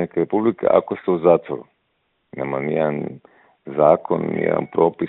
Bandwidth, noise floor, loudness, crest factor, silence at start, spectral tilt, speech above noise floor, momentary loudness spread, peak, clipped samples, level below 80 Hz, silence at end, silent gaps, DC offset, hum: 4.1 kHz; -69 dBFS; -20 LUFS; 20 dB; 0 s; -11 dB/octave; 50 dB; 14 LU; 0 dBFS; under 0.1%; -60 dBFS; 0 s; none; under 0.1%; none